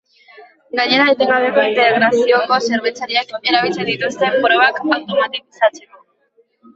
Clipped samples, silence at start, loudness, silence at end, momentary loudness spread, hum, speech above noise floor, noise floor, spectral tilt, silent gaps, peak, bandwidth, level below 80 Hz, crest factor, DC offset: under 0.1%; 0.4 s; -15 LUFS; 0.95 s; 7 LU; none; 43 dB; -58 dBFS; -3.5 dB/octave; none; -2 dBFS; 8 kHz; -64 dBFS; 14 dB; under 0.1%